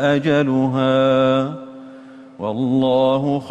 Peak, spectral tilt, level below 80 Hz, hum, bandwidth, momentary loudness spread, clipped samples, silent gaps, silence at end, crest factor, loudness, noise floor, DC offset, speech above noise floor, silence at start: -6 dBFS; -7.5 dB/octave; -56 dBFS; none; 8.4 kHz; 14 LU; under 0.1%; none; 0 s; 12 dB; -17 LUFS; -40 dBFS; under 0.1%; 23 dB; 0 s